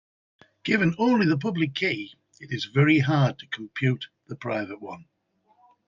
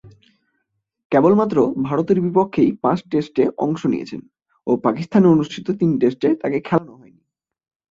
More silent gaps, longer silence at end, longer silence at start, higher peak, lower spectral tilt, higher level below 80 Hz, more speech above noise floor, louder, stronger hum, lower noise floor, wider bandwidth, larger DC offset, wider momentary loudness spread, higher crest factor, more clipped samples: second, none vs 1.05-1.10 s; second, 0.85 s vs 1.05 s; first, 0.65 s vs 0.05 s; second, -8 dBFS vs -2 dBFS; second, -7 dB/octave vs -8.5 dB/octave; second, -64 dBFS vs -58 dBFS; second, 41 dB vs 56 dB; second, -25 LUFS vs -18 LUFS; neither; second, -66 dBFS vs -73 dBFS; about the same, 7.4 kHz vs 7.6 kHz; neither; first, 17 LU vs 8 LU; about the same, 18 dB vs 16 dB; neither